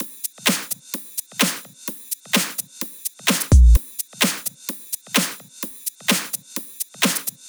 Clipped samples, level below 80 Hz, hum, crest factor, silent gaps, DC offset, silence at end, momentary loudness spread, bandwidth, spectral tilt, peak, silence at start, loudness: under 0.1%; -24 dBFS; none; 20 dB; none; under 0.1%; 0 s; 14 LU; over 20 kHz; -3 dB/octave; -2 dBFS; 0 s; -21 LUFS